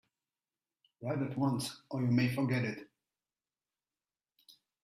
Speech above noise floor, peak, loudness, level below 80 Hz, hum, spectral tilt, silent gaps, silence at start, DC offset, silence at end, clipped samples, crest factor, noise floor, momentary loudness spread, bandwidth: over 57 dB; -18 dBFS; -34 LUFS; -72 dBFS; none; -6.5 dB/octave; none; 1 s; under 0.1%; 0.35 s; under 0.1%; 18 dB; under -90 dBFS; 9 LU; 14.5 kHz